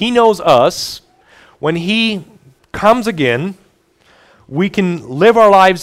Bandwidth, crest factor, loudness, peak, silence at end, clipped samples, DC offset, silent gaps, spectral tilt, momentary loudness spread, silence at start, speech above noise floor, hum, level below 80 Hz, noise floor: 16 kHz; 14 dB; -13 LUFS; 0 dBFS; 0 s; 0.1%; under 0.1%; none; -5 dB/octave; 17 LU; 0 s; 41 dB; none; -48 dBFS; -52 dBFS